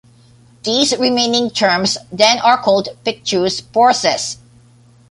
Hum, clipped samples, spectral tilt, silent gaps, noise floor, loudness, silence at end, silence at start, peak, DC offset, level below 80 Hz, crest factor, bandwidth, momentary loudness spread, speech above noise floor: none; under 0.1%; -2.5 dB/octave; none; -47 dBFS; -15 LUFS; 0.75 s; 0.65 s; 0 dBFS; under 0.1%; -54 dBFS; 16 dB; 11.5 kHz; 9 LU; 32 dB